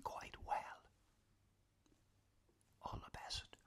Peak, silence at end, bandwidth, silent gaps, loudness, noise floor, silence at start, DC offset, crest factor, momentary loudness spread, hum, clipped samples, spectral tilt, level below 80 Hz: -30 dBFS; 0.1 s; 15 kHz; none; -49 LUFS; -78 dBFS; 0 s; under 0.1%; 22 dB; 10 LU; none; under 0.1%; -3 dB/octave; -64 dBFS